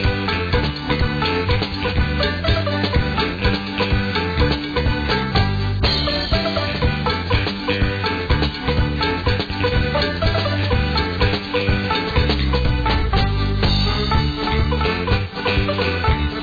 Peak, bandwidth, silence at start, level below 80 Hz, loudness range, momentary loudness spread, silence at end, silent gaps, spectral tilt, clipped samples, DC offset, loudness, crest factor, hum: -6 dBFS; 5 kHz; 0 s; -24 dBFS; 1 LU; 2 LU; 0 s; none; -7 dB/octave; under 0.1%; 0.2%; -19 LUFS; 14 dB; none